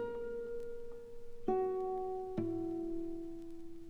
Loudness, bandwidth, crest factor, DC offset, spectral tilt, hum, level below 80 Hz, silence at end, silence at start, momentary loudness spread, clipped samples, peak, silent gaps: -40 LUFS; 8.8 kHz; 18 dB; under 0.1%; -8.5 dB/octave; none; -56 dBFS; 0 s; 0 s; 14 LU; under 0.1%; -22 dBFS; none